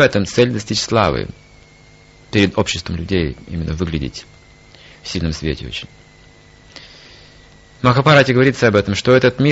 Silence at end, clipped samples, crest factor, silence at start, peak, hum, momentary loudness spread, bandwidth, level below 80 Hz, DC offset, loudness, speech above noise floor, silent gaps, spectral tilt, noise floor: 0 s; under 0.1%; 18 dB; 0 s; 0 dBFS; none; 17 LU; 8.2 kHz; -38 dBFS; under 0.1%; -16 LUFS; 30 dB; none; -5.5 dB/octave; -46 dBFS